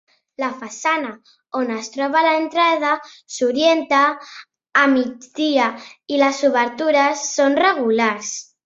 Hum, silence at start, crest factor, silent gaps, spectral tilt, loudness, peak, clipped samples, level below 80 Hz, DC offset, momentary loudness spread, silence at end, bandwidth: none; 0.4 s; 16 dB; none; -2 dB/octave; -18 LUFS; -2 dBFS; under 0.1%; -68 dBFS; under 0.1%; 11 LU; 0.2 s; 8 kHz